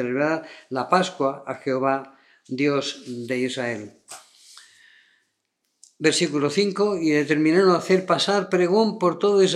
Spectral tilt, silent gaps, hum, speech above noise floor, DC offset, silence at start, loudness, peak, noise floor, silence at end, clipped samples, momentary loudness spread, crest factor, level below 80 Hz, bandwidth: -4.5 dB/octave; none; none; 53 dB; under 0.1%; 0 s; -22 LUFS; -4 dBFS; -75 dBFS; 0 s; under 0.1%; 12 LU; 20 dB; -78 dBFS; 12 kHz